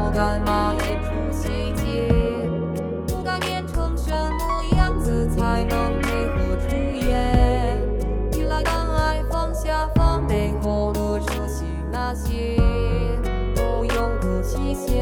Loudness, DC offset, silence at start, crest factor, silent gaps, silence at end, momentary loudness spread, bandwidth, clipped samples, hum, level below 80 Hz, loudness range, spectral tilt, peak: -23 LUFS; under 0.1%; 0 s; 16 dB; none; 0 s; 5 LU; 18 kHz; under 0.1%; none; -24 dBFS; 2 LU; -6.5 dB/octave; -4 dBFS